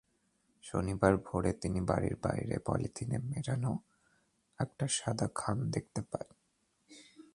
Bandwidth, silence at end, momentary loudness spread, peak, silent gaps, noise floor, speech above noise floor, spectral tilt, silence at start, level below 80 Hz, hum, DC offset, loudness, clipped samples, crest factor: 11.5 kHz; 0.1 s; 11 LU; -10 dBFS; none; -77 dBFS; 43 dB; -5.5 dB/octave; 0.65 s; -54 dBFS; none; under 0.1%; -35 LUFS; under 0.1%; 26 dB